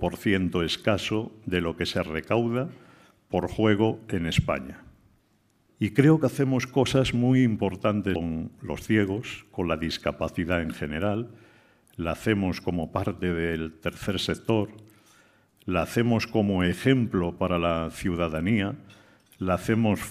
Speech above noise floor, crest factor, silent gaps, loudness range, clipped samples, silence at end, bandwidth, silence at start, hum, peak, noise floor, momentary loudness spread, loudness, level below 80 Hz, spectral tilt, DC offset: 41 dB; 22 dB; none; 5 LU; under 0.1%; 0 s; 15.5 kHz; 0 s; none; -4 dBFS; -66 dBFS; 10 LU; -26 LUFS; -48 dBFS; -6.5 dB/octave; under 0.1%